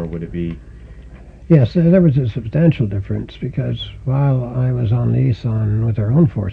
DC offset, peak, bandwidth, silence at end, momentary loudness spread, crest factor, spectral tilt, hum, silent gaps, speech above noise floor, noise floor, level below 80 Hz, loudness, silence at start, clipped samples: under 0.1%; -2 dBFS; 4.9 kHz; 0 s; 12 LU; 16 dB; -10.5 dB/octave; none; none; 22 dB; -37 dBFS; -36 dBFS; -17 LUFS; 0 s; under 0.1%